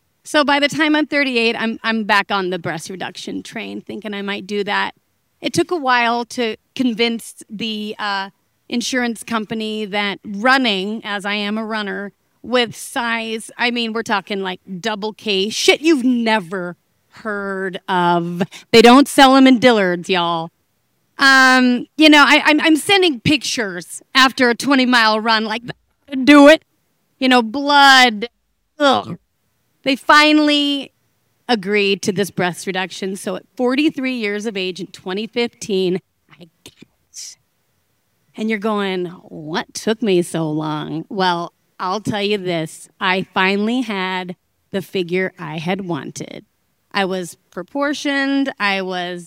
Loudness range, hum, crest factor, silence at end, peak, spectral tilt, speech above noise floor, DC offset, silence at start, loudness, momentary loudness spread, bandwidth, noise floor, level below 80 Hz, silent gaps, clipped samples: 11 LU; none; 18 dB; 0 s; 0 dBFS; -4 dB/octave; 50 dB; under 0.1%; 0.25 s; -16 LUFS; 17 LU; 18 kHz; -67 dBFS; -58 dBFS; none; 0.2%